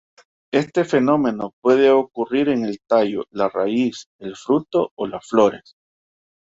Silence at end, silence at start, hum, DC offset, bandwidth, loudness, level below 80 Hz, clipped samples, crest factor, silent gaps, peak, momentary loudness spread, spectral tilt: 1 s; 0.55 s; none; under 0.1%; 8 kHz; -19 LUFS; -62 dBFS; under 0.1%; 18 dB; 1.53-1.62 s, 4.06-4.19 s, 4.91-4.97 s; -2 dBFS; 9 LU; -6.5 dB/octave